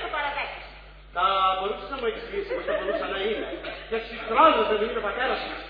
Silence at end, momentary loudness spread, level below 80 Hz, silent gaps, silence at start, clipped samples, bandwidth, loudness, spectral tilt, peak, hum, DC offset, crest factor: 0 s; 14 LU; -48 dBFS; none; 0 s; under 0.1%; 5.2 kHz; -26 LUFS; -6.5 dB/octave; -6 dBFS; none; under 0.1%; 20 dB